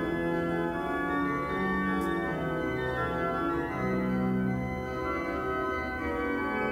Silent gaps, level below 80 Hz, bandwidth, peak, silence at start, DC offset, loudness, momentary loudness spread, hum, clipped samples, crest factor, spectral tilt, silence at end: none; -46 dBFS; 16 kHz; -18 dBFS; 0 s; under 0.1%; -30 LUFS; 3 LU; none; under 0.1%; 12 dB; -7.5 dB/octave; 0 s